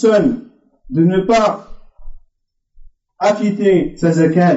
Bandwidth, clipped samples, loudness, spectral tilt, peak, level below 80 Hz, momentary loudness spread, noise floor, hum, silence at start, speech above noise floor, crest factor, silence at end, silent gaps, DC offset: 8 kHz; under 0.1%; -15 LUFS; -6.5 dB/octave; -2 dBFS; -40 dBFS; 8 LU; -65 dBFS; none; 0 s; 52 dB; 12 dB; 0 s; none; under 0.1%